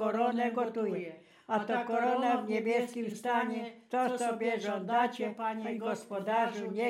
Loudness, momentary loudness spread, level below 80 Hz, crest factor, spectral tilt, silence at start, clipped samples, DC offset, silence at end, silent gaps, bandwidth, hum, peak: -33 LUFS; 6 LU; under -90 dBFS; 16 dB; -5 dB/octave; 0 s; under 0.1%; under 0.1%; 0 s; none; 15 kHz; none; -16 dBFS